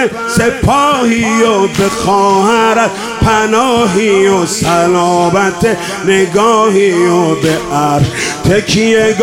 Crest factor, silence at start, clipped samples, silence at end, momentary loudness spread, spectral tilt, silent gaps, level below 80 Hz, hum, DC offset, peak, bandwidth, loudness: 10 dB; 0 s; under 0.1%; 0 s; 4 LU; -4.5 dB/octave; none; -34 dBFS; none; 0.2%; 0 dBFS; 16.5 kHz; -10 LUFS